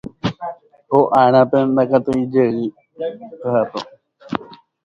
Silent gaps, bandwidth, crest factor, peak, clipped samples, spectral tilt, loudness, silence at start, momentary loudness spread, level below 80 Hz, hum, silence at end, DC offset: none; 8 kHz; 18 dB; 0 dBFS; under 0.1%; -8 dB/octave; -18 LUFS; 0.05 s; 16 LU; -54 dBFS; none; 0.3 s; under 0.1%